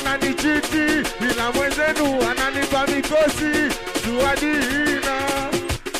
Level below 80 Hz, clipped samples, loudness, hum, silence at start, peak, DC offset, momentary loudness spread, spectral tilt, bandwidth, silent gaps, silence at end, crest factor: -38 dBFS; under 0.1%; -20 LUFS; none; 0 s; -10 dBFS; under 0.1%; 3 LU; -3.5 dB/octave; 15.5 kHz; none; 0 s; 10 dB